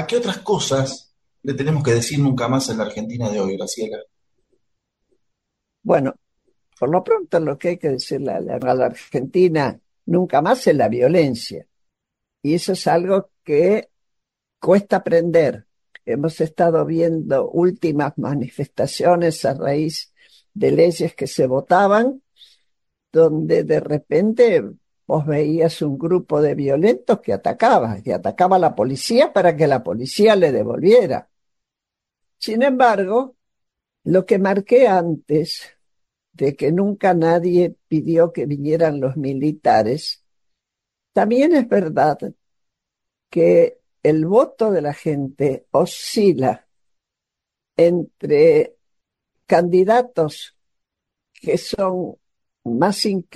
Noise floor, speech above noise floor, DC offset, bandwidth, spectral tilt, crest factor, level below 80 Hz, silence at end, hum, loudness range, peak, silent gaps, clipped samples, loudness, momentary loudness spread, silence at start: -85 dBFS; 68 dB; under 0.1%; 12.5 kHz; -6 dB/octave; 16 dB; -58 dBFS; 0.15 s; none; 4 LU; -2 dBFS; none; under 0.1%; -18 LUFS; 11 LU; 0 s